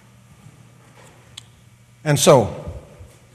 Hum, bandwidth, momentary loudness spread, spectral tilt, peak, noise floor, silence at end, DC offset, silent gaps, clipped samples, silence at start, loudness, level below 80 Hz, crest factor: none; 15.5 kHz; 28 LU; -4.5 dB/octave; 0 dBFS; -50 dBFS; 0.55 s; under 0.1%; none; under 0.1%; 2.05 s; -16 LUFS; -48 dBFS; 22 dB